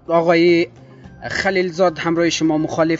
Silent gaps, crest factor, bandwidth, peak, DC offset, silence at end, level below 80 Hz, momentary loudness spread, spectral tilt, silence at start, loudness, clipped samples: none; 16 dB; 7.8 kHz; -2 dBFS; under 0.1%; 0 s; -50 dBFS; 10 LU; -5 dB/octave; 0.1 s; -17 LUFS; under 0.1%